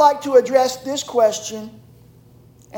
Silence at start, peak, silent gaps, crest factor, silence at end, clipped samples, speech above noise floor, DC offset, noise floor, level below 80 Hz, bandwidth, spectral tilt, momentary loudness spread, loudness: 0 s; -2 dBFS; none; 18 dB; 0 s; under 0.1%; 31 dB; under 0.1%; -48 dBFS; -60 dBFS; 17 kHz; -3 dB/octave; 17 LU; -18 LUFS